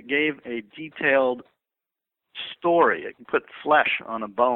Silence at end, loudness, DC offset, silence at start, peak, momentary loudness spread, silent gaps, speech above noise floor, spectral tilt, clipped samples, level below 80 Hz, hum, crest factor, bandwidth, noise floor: 0 s; -23 LUFS; under 0.1%; 0.05 s; -4 dBFS; 15 LU; none; 64 dB; -7.5 dB/octave; under 0.1%; -70 dBFS; none; 20 dB; 4.2 kHz; -87 dBFS